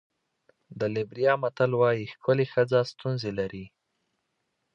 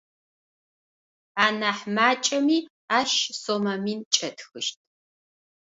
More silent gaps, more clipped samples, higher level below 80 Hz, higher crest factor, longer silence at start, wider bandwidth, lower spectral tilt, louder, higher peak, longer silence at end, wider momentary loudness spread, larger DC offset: second, none vs 2.70-2.88 s, 4.06-4.11 s; neither; first, -64 dBFS vs -74 dBFS; about the same, 18 dB vs 22 dB; second, 0.7 s vs 1.35 s; about the same, 7.4 kHz vs 8 kHz; first, -7.5 dB/octave vs -2.5 dB/octave; second, -27 LUFS vs -24 LUFS; second, -10 dBFS vs -4 dBFS; about the same, 1.05 s vs 0.95 s; about the same, 9 LU vs 10 LU; neither